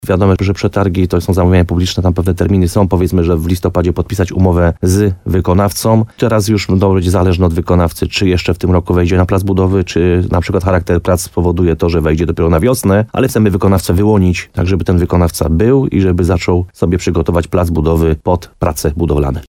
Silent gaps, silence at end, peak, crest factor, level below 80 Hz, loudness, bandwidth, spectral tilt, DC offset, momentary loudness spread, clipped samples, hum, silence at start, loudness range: none; 0.05 s; 0 dBFS; 12 dB; -26 dBFS; -12 LUFS; 16.5 kHz; -7 dB/octave; under 0.1%; 4 LU; under 0.1%; none; 0.05 s; 1 LU